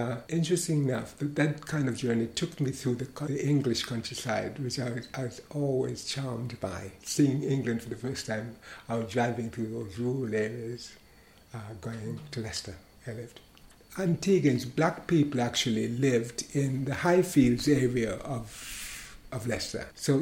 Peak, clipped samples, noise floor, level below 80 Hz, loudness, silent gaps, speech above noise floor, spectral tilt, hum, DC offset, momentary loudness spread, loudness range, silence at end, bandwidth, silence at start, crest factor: -10 dBFS; under 0.1%; -57 dBFS; -56 dBFS; -30 LUFS; none; 27 dB; -5.5 dB/octave; none; under 0.1%; 14 LU; 9 LU; 0 s; 16.5 kHz; 0 s; 20 dB